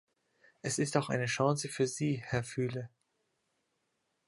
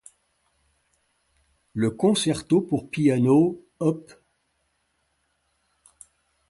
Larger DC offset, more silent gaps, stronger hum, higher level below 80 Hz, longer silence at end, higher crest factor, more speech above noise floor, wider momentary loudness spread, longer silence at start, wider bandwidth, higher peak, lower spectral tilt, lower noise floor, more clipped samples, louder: neither; neither; neither; second, -70 dBFS vs -62 dBFS; second, 1.4 s vs 2.45 s; about the same, 22 dB vs 18 dB; about the same, 48 dB vs 50 dB; about the same, 9 LU vs 9 LU; second, 0.65 s vs 1.75 s; about the same, 11.5 kHz vs 11.5 kHz; second, -12 dBFS vs -8 dBFS; about the same, -5 dB/octave vs -6 dB/octave; first, -81 dBFS vs -72 dBFS; neither; second, -34 LUFS vs -23 LUFS